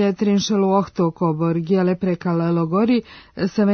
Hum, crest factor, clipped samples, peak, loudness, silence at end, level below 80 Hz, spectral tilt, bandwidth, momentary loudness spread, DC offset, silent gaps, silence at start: none; 12 dB; under 0.1%; -6 dBFS; -20 LUFS; 0 s; -56 dBFS; -7 dB/octave; 6.6 kHz; 4 LU; under 0.1%; none; 0 s